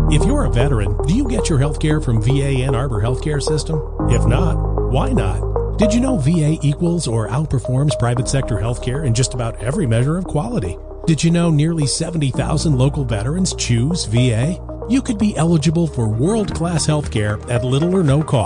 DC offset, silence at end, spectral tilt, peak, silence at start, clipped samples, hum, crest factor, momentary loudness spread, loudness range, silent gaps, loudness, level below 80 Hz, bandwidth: under 0.1%; 0 s; -6 dB/octave; 0 dBFS; 0 s; under 0.1%; none; 16 dB; 5 LU; 2 LU; none; -18 LUFS; -26 dBFS; 10.5 kHz